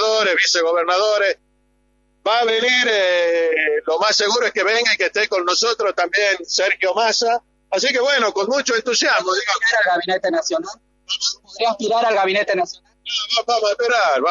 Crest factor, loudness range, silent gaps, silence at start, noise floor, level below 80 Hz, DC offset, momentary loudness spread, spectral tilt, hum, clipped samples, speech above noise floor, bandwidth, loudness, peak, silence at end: 16 dB; 3 LU; none; 0 s; -62 dBFS; -64 dBFS; under 0.1%; 7 LU; -0.5 dB/octave; none; under 0.1%; 44 dB; 7.8 kHz; -17 LUFS; -2 dBFS; 0 s